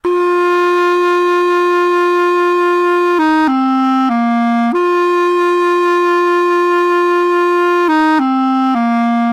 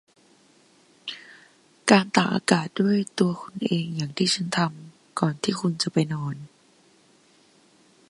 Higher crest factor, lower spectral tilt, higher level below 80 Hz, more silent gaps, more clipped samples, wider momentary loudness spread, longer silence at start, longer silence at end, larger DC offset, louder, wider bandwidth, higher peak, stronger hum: second, 6 dB vs 26 dB; about the same, -5 dB/octave vs -5 dB/octave; first, -58 dBFS vs -68 dBFS; neither; neither; second, 2 LU vs 17 LU; second, 0.05 s vs 1.05 s; second, 0 s vs 1.65 s; neither; first, -12 LUFS vs -24 LUFS; about the same, 11.5 kHz vs 11.5 kHz; second, -6 dBFS vs 0 dBFS; neither